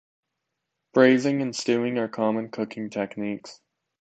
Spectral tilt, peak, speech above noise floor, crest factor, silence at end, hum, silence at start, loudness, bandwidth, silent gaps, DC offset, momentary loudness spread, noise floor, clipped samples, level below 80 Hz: -5.5 dB/octave; -4 dBFS; 58 dB; 22 dB; 0.5 s; none; 0.95 s; -24 LUFS; 8.8 kHz; none; under 0.1%; 13 LU; -82 dBFS; under 0.1%; -74 dBFS